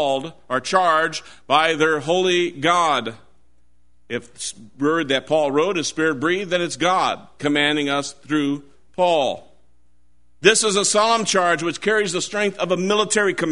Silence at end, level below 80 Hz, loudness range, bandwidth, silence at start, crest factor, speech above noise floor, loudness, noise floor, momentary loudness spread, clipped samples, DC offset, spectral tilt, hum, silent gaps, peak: 0 s; -60 dBFS; 4 LU; 11 kHz; 0 s; 20 dB; 43 dB; -19 LUFS; -63 dBFS; 10 LU; under 0.1%; 0.5%; -3 dB/octave; none; none; 0 dBFS